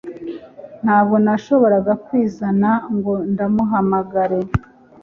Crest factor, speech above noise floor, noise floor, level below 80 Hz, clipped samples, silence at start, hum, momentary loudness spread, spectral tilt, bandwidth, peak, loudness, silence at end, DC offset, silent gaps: 16 dB; 20 dB; -36 dBFS; -44 dBFS; under 0.1%; 0.05 s; none; 10 LU; -9.5 dB/octave; 6.6 kHz; -2 dBFS; -17 LUFS; 0.45 s; under 0.1%; none